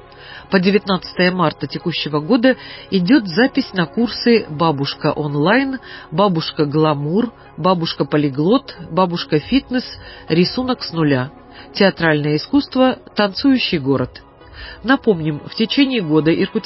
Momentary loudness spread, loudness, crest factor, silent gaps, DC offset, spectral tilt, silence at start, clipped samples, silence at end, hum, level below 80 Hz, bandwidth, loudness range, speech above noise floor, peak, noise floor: 9 LU; -17 LUFS; 16 dB; none; under 0.1%; -10 dB/octave; 0.15 s; under 0.1%; 0 s; none; -48 dBFS; 5.8 kHz; 2 LU; 21 dB; 0 dBFS; -38 dBFS